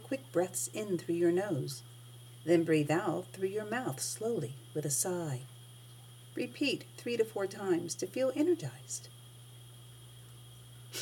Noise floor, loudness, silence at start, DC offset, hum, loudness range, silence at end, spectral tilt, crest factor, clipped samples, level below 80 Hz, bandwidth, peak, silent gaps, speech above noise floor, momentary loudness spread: -53 dBFS; -34 LUFS; 0 s; under 0.1%; none; 4 LU; 0 s; -4.5 dB/octave; 18 dB; under 0.1%; -76 dBFS; 18.5 kHz; -16 dBFS; none; 19 dB; 22 LU